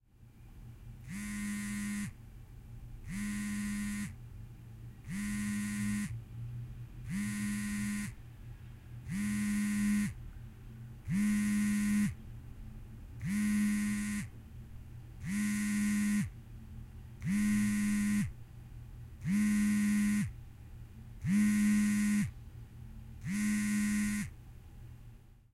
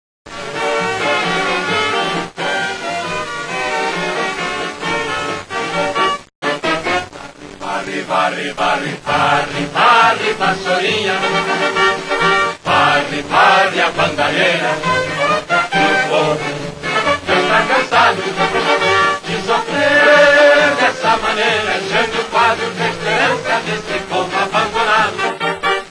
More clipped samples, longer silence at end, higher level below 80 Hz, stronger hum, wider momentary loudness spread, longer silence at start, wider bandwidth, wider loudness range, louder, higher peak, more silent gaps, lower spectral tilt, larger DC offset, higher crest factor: neither; first, 0.2 s vs 0 s; second, -52 dBFS vs -46 dBFS; neither; first, 21 LU vs 10 LU; about the same, 0.2 s vs 0.25 s; first, 14 kHz vs 11 kHz; about the same, 8 LU vs 7 LU; second, -34 LUFS vs -15 LUFS; second, -22 dBFS vs 0 dBFS; second, none vs 6.35-6.42 s; first, -5 dB/octave vs -3.5 dB/octave; neither; about the same, 14 dB vs 16 dB